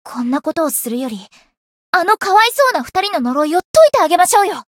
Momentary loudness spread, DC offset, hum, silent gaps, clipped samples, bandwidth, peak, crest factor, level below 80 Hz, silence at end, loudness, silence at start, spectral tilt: 10 LU; under 0.1%; none; 1.57-1.93 s, 3.65-3.74 s; under 0.1%; 17 kHz; 0 dBFS; 14 dB; -56 dBFS; 0.15 s; -14 LUFS; 0.05 s; -2 dB/octave